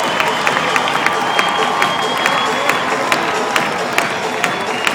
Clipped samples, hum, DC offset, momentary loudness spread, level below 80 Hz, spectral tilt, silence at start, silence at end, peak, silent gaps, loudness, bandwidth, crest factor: under 0.1%; none; under 0.1%; 3 LU; -58 dBFS; -2.5 dB/octave; 0 s; 0 s; 0 dBFS; none; -15 LUFS; 20 kHz; 16 dB